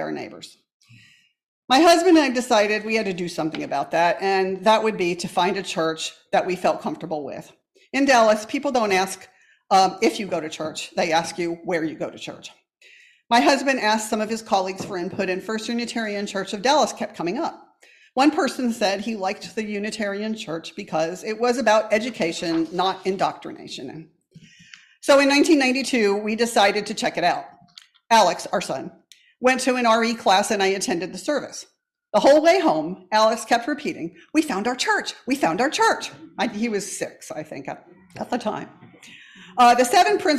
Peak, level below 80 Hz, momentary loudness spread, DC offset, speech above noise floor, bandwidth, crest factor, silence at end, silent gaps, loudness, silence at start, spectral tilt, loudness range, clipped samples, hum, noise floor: -6 dBFS; -64 dBFS; 15 LU; under 0.1%; 34 dB; 14.5 kHz; 16 dB; 0 s; 0.74-0.80 s, 1.43-1.68 s; -21 LUFS; 0 s; -3.5 dB/octave; 5 LU; under 0.1%; none; -56 dBFS